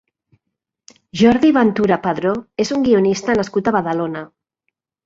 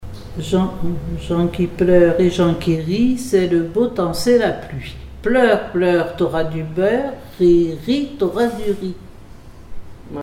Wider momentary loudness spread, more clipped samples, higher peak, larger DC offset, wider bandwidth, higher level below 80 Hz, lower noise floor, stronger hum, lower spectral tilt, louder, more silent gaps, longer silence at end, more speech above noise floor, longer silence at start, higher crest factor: second, 9 LU vs 13 LU; neither; about the same, -2 dBFS vs -2 dBFS; second, under 0.1% vs 0.2%; second, 7.8 kHz vs 15.5 kHz; second, -52 dBFS vs -36 dBFS; first, -79 dBFS vs -38 dBFS; neither; about the same, -6 dB/octave vs -6.5 dB/octave; about the same, -16 LUFS vs -18 LUFS; neither; first, 0.8 s vs 0 s; first, 63 dB vs 21 dB; first, 1.15 s vs 0 s; about the same, 16 dB vs 16 dB